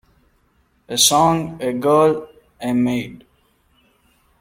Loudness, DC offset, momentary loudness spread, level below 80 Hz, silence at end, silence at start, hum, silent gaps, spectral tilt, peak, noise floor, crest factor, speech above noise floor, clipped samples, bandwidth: -17 LUFS; under 0.1%; 14 LU; -54 dBFS; 1.25 s; 0.9 s; none; none; -3.5 dB/octave; 0 dBFS; -61 dBFS; 20 dB; 44 dB; under 0.1%; 16.5 kHz